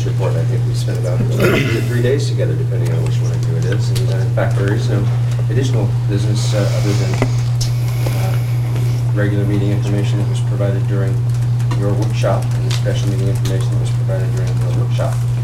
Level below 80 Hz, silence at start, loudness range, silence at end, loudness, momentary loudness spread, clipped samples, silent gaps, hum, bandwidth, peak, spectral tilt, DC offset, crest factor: -34 dBFS; 0 s; 1 LU; 0 s; -16 LUFS; 2 LU; under 0.1%; none; none; 13.5 kHz; 0 dBFS; -7 dB/octave; under 0.1%; 14 dB